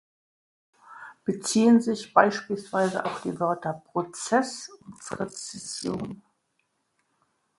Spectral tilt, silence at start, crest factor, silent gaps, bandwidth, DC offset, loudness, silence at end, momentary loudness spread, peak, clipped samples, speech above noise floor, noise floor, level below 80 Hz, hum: -4.5 dB/octave; 0.9 s; 24 dB; none; 11.5 kHz; under 0.1%; -26 LUFS; 1.4 s; 18 LU; -4 dBFS; under 0.1%; 49 dB; -74 dBFS; -68 dBFS; none